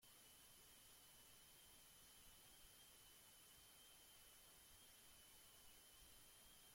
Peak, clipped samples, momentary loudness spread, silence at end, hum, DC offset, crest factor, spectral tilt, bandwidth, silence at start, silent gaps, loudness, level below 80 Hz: -54 dBFS; under 0.1%; 0 LU; 0 s; none; under 0.1%; 14 dB; -1 dB/octave; 16.5 kHz; 0 s; none; -65 LUFS; -80 dBFS